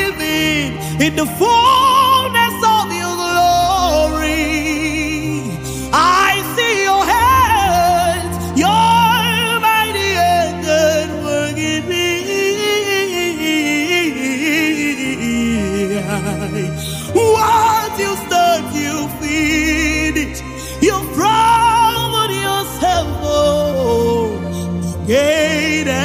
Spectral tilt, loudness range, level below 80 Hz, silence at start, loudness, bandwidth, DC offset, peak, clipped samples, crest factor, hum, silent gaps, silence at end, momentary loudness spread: -4 dB/octave; 3 LU; -34 dBFS; 0 s; -15 LUFS; 15.5 kHz; under 0.1%; 0 dBFS; under 0.1%; 14 dB; none; none; 0 s; 9 LU